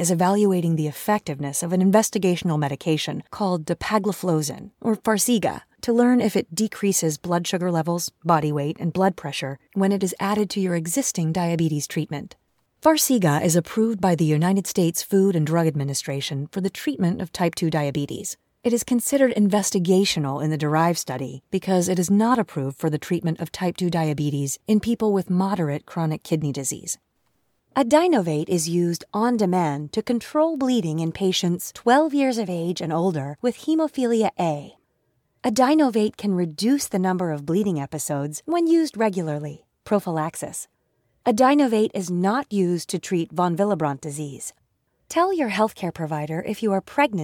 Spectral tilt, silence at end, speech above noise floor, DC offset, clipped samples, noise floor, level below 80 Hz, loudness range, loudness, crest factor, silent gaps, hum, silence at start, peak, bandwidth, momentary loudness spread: -5.5 dB/octave; 0 s; 48 dB; under 0.1%; under 0.1%; -70 dBFS; -60 dBFS; 3 LU; -22 LUFS; 18 dB; none; none; 0 s; -4 dBFS; 18 kHz; 9 LU